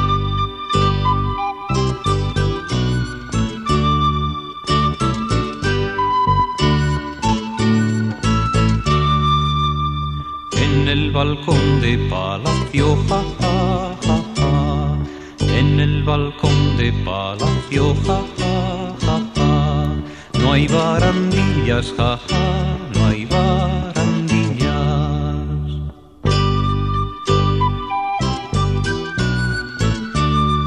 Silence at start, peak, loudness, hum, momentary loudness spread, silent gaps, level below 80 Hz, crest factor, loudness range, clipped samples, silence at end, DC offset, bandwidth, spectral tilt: 0 s; -2 dBFS; -18 LUFS; none; 6 LU; none; -28 dBFS; 16 dB; 2 LU; under 0.1%; 0 s; 0.1%; 11 kHz; -6 dB/octave